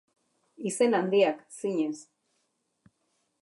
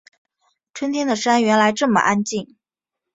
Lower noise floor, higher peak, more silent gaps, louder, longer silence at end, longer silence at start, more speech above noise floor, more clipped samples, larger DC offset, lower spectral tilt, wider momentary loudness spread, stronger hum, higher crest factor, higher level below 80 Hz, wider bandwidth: second, -76 dBFS vs -85 dBFS; second, -10 dBFS vs -2 dBFS; neither; second, -28 LUFS vs -18 LUFS; first, 1.4 s vs 0.7 s; second, 0.6 s vs 0.75 s; second, 50 dB vs 67 dB; neither; neither; about the same, -4.5 dB/octave vs -4 dB/octave; about the same, 12 LU vs 12 LU; neither; about the same, 20 dB vs 18 dB; second, -86 dBFS vs -64 dBFS; first, 11.5 kHz vs 8.2 kHz